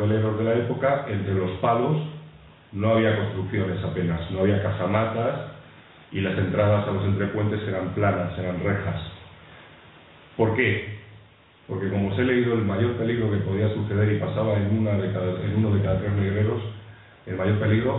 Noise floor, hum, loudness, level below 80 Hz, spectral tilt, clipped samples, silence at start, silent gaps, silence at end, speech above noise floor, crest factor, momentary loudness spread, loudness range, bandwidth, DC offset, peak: -53 dBFS; none; -24 LUFS; -50 dBFS; -12 dB/octave; under 0.1%; 0 s; none; 0 s; 29 dB; 16 dB; 12 LU; 4 LU; 4.1 kHz; under 0.1%; -8 dBFS